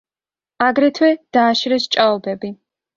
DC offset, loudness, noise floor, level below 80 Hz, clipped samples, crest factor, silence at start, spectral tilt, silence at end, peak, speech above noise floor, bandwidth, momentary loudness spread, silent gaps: under 0.1%; -16 LUFS; under -90 dBFS; -64 dBFS; under 0.1%; 16 dB; 0.6 s; -4 dB/octave; 0.45 s; -2 dBFS; over 74 dB; 7.6 kHz; 11 LU; none